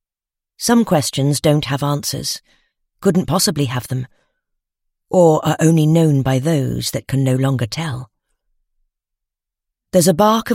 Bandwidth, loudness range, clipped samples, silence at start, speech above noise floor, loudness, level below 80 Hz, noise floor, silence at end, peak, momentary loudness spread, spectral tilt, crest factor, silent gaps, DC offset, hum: 16.5 kHz; 5 LU; under 0.1%; 0.6 s; 71 dB; -17 LUFS; -48 dBFS; -87 dBFS; 0 s; 0 dBFS; 11 LU; -5.5 dB/octave; 18 dB; none; under 0.1%; none